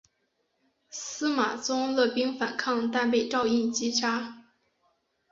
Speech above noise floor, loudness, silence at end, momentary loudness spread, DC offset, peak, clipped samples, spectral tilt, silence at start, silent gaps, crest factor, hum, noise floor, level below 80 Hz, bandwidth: 48 dB; -27 LUFS; 0.9 s; 9 LU; under 0.1%; -12 dBFS; under 0.1%; -2.5 dB/octave; 0.9 s; none; 18 dB; none; -75 dBFS; -70 dBFS; 7.8 kHz